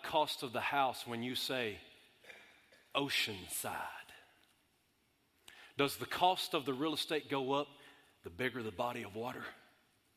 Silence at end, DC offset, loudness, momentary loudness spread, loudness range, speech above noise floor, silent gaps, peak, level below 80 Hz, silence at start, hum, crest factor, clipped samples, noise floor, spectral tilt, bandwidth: 0.6 s; under 0.1%; -37 LUFS; 19 LU; 4 LU; 38 dB; none; -16 dBFS; -72 dBFS; 0 s; none; 24 dB; under 0.1%; -76 dBFS; -3.5 dB/octave; 16 kHz